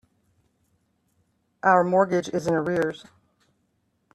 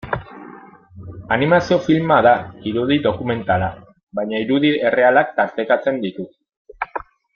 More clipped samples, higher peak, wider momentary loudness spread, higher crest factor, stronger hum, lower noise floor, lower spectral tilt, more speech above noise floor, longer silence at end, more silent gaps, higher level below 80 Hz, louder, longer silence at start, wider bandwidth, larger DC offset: neither; second, -6 dBFS vs -2 dBFS; second, 9 LU vs 18 LU; about the same, 20 dB vs 18 dB; neither; first, -71 dBFS vs -41 dBFS; about the same, -6.5 dB/octave vs -7 dB/octave; first, 49 dB vs 24 dB; first, 1.1 s vs 0.35 s; second, none vs 4.03-4.07 s, 6.57-6.65 s; second, -66 dBFS vs -50 dBFS; second, -23 LUFS vs -18 LUFS; first, 1.65 s vs 0.05 s; first, 12.5 kHz vs 7 kHz; neither